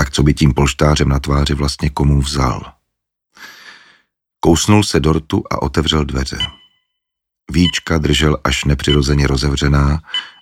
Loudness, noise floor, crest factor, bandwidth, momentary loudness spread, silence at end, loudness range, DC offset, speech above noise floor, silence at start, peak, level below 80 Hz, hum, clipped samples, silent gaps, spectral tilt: -15 LUFS; -79 dBFS; 16 dB; 15.5 kHz; 7 LU; 0.1 s; 3 LU; under 0.1%; 65 dB; 0 s; 0 dBFS; -24 dBFS; none; under 0.1%; none; -5 dB/octave